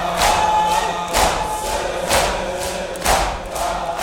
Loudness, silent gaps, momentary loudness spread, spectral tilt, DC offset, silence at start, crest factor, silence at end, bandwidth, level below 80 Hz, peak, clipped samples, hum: -19 LUFS; none; 7 LU; -2.5 dB/octave; under 0.1%; 0 s; 18 dB; 0 s; 17.5 kHz; -32 dBFS; -2 dBFS; under 0.1%; none